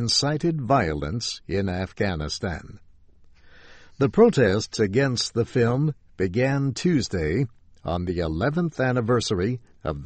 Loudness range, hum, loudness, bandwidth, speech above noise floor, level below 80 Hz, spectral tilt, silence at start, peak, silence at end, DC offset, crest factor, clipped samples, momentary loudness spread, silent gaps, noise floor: 5 LU; none; -24 LUFS; 8.8 kHz; 28 dB; -44 dBFS; -5.5 dB/octave; 0 s; -4 dBFS; 0 s; under 0.1%; 20 dB; under 0.1%; 8 LU; none; -51 dBFS